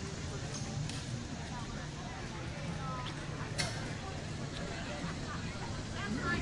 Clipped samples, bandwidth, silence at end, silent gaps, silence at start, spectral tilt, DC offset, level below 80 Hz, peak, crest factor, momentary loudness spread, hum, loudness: under 0.1%; 11.5 kHz; 0 s; none; 0 s; -4.5 dB/octave; under 0.1%; -52 dBFS; -20 dBFS; 20 dB; 5 LU; none; -40 LUFS